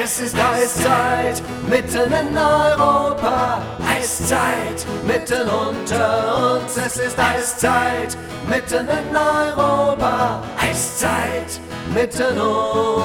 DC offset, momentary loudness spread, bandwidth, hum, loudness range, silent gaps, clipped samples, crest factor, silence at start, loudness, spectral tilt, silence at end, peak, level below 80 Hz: under 0.1%; 6 LU; 19 kHz; none; 2 LU; none; under 0.1%; 16 dB; 0 s; -18 LUFS; -4 dB/octave; 0 s; -2 dBFS; -40 dBFS